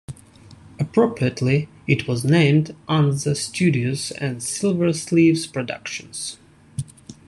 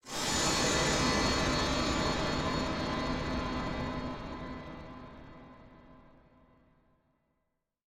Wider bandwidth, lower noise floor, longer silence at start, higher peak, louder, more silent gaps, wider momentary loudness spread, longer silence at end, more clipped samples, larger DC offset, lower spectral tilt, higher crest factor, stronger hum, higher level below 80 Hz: second, 12.5 kHz vs 16 kHz; second, -46 dBFS vs -82 dBFS; about the same, 0.1 s vs 0.05 s; first, -2 dBFS vs -18 dBFS; first, -21 LUFS vs -31 LUFS; neither; second, 16 LU vs 19 LU; second, 0.15 s vs 1.85 s; neither; neither; first, -5.5 dB/octave vs -3.5 dB/octave; about the same, 18 dB vs 16 dB; neither; second, -56 dBFS vs -46 dBFS